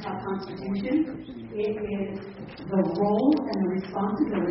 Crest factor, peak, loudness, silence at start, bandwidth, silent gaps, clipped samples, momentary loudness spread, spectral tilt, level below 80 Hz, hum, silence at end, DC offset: 16 dB; -10 dBFS; -27 LUFS; 0 s; 5.8 kHz; none; under 0.1%; 13 LU; -7 dB/octave; -56 dBFS; none; 0 s; under 0.1%